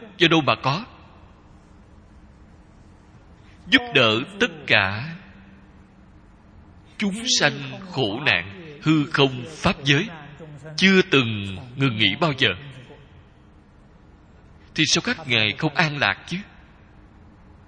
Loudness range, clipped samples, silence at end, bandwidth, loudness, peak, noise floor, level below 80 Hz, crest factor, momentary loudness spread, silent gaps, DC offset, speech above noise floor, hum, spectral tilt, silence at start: 5 LU; under 0.1%; 1.25 s; 10 kHz; -20 LUFS; 0 dBFS; -51 dBFS; -52 dBFS; 24 dB; 16 LU; none; under 0.1%; 29 dB; none; -4 dB/octave; 0 s